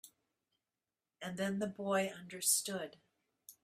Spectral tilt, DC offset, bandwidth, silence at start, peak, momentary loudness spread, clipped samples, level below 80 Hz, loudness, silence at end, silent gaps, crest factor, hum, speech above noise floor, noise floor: -3 dB/octave; under 0.1%; 15.5 kHz; 0.05 s; -18 dBFS; 15 LU; under 0.1%; -82 dBFS; -36 LUFS; 0.1 s; none; 22 dB; none; over 52 dB; under -90 dBFS